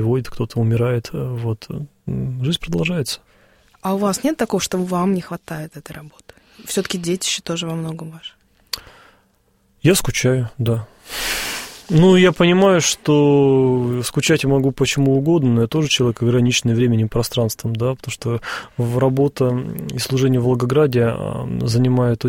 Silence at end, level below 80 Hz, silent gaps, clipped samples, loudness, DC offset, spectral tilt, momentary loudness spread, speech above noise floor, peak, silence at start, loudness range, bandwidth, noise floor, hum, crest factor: 0 s; -44 dBFS; none; under 0.1%; -18 LUFS; under 0.1%; -5.5 dB/octave; 15 LU; 43 dB; -2 dBFS; 0 s; 9 LU; 16.5 kHz; -60 dBFS; none; 16 dB